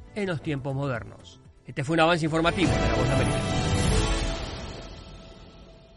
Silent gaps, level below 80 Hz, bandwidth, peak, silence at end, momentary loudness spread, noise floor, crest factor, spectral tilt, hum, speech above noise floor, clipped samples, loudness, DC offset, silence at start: none; -36 dBFS; 11.5 kHz; -8 dBFS; 0.25 s; 19 LU; -49 dBFS; 18 dB; -5.5 dB/octave; none; 24 dB; under 0.1%; -26 LUFS; under 0.1%; 0 s